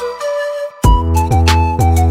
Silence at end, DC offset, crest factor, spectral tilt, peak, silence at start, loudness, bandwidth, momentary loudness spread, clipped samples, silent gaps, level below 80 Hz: 0 s; under 0.1%; 12 dB; -6 dB/octave; 0 dBFS; 0 s; -14 LUFS; 15.5 kHz; 8 LU; under 0.1%; none; -16 dBFS